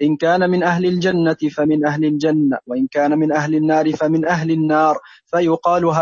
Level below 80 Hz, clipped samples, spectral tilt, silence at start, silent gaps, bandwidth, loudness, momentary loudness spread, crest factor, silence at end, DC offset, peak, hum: -58 dBFS; under 0.1%; -7 dB/octave; 0 s; none; 7.2 kHz; -17 LUFS; 4 LU; 14 dB; 0 s; under 0.1%; -4 dBFS; none